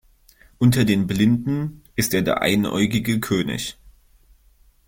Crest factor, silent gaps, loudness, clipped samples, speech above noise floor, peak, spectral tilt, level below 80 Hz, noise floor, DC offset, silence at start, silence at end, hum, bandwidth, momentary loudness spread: 18 dB; none; -21 LUFS; under 0.1%; 36 dB; -4 dBFS; -5.5 dB/octave; -48 dBFS; -56 dBFS; under 0.1%; 0.6 s; 1 s; none; 17 kHz; 8 LU